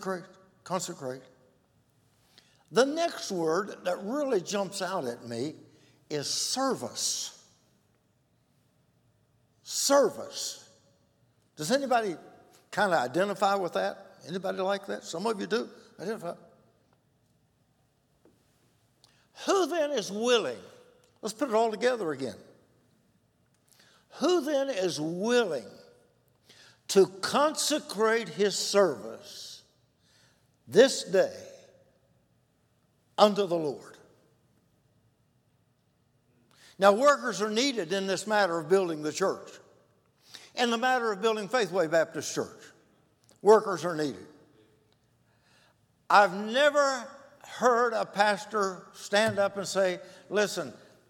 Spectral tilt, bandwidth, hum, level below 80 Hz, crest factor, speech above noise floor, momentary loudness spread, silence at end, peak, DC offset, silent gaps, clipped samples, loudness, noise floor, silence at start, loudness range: -3 dB/octave; 18.5 kHz; none; -80 dBFS; 26 dB; 42 dB; 16 LU; 0.35 s; -4 dBFS; under 0.1%; none; under 0.1%; -28 LUFS; -70 dBFS; 0 s; 7 LU